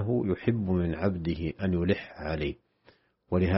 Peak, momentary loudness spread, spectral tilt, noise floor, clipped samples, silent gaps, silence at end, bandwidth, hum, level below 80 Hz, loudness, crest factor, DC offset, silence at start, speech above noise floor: -10 dBFS; 6 LU; -7 dB/octave; -63 dBFS; under 0.1%; none; 0 s; 5.8 kHz; none; -46 dBFS; -30 LUFS; 18 dB; under 0.1%; 0 s; 35 dB